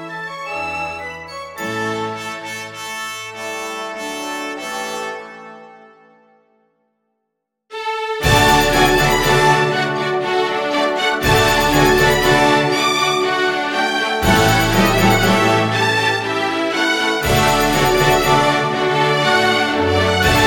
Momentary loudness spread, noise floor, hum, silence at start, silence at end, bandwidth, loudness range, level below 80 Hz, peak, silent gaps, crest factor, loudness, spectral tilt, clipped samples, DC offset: 13 LU; -76 dBFS; none; 0 s; 0 s; 17 kHz; 12 LU; -34 dBFS; 0 dBFS; none; 16 dB; -16 LUFS; -4 dB/octave; under 0.1%; under 0.1%